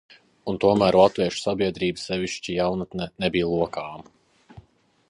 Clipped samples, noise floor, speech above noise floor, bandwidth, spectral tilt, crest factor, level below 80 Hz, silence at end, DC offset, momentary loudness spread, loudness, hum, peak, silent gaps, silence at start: under 0.1%; -58 dBFS; 35 dB; 11 kHz; -5.5 dB/octave; 22 dB; -52 dBFS; 0.5 s; under 0.1%; 14 LU; -23 LUFS; none; -2 dBFS; none; 0.45 s